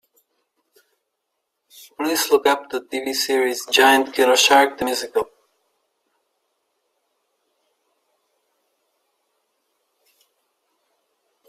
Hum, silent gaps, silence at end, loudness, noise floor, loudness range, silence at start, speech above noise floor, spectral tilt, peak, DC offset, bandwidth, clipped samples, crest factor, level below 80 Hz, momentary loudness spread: none; none; 6.25 s; -18 LUFS; -77 dBFS; 10 LU; 2 s; 59 dB; -0.5 dB/octave; -2 dBFS; under 0.1%; 16 kHz; under 0.1%; 22 dB; -66 dBFS; 12 LU